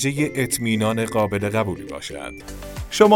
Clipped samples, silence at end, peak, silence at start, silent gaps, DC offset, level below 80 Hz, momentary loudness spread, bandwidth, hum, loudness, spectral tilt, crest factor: under 0.1%; 0 s; -2 dBFS; 0 s; none; under 0.1%; -44 dBFS; 13 LU; 18 kHz; none; -22 LUFS; -5 dB/octave; 20 dB